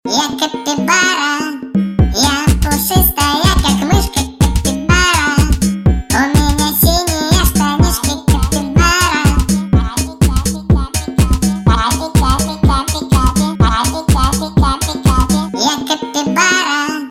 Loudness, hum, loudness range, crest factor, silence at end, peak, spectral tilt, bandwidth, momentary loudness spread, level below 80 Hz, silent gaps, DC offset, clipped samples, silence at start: -13 LUFS; none; 2 LU; 12 dB; 0 s; 0 dBFS; -4 dB/octave; 16.5 kHz; 5 LU; -18 dBFS; none; under 0.1%; under 0.1%; 0.05 s